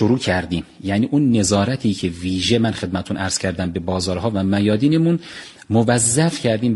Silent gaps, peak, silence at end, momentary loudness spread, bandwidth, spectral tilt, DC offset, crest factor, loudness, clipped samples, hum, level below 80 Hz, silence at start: none; -2 dBFS; 0 s; 8 LU; 11.5 kHz; -5 dB/octave; under 0.1%; 18 dB; -19 LUFS; under 0.1%; none; -46 dBFS; 0 s